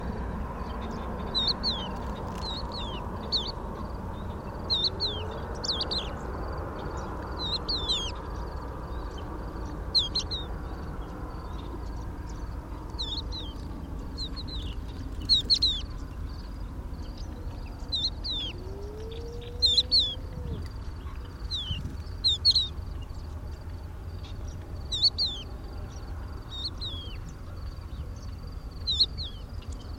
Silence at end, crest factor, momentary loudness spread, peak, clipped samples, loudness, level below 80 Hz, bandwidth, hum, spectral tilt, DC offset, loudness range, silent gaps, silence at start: 0 s; 20 dB; 17 LU; -12 dBFS; under 0.1%; -30 LUFS; -38 dBFS; 16.5 kHz; none; -4 dB/octave; under 0.1%; 9 LU; none; 0 s